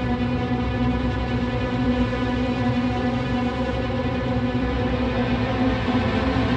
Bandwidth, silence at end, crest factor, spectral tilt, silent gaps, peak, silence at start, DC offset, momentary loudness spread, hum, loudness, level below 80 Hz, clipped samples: 8 kHz; 0 s; 12 dB; -7.5 dB/octave; none; -10 dBFS; 0 s; under 0.1%; 2 LU; none; -23 LUFS; -32 dBFS; under 0.1%